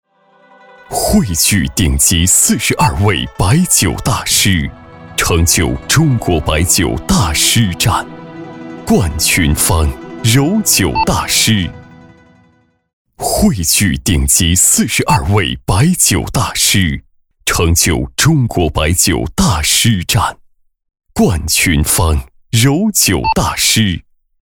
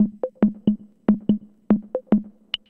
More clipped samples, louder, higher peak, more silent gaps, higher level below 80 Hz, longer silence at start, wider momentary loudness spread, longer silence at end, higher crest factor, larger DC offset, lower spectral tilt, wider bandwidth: neither; first, -12 LUFS vs -23 LUFS; first, 0 dBFS vs -4 dBFS; first, 12.93-13.05 s vs none; first, -26 dBFS vs -52 dBFS; first, 0.9 s vs 0 s; first, 8 LU vs 4 LU; about the same, 0.4 s vs 0.4 s; about the same, 14 dB vs 18 dB; first, 0.4% vs under 0.1%; second, -3.5 dB/octave vs -9.5 dB/octave; first, 19 kHz vs 4.6 kHz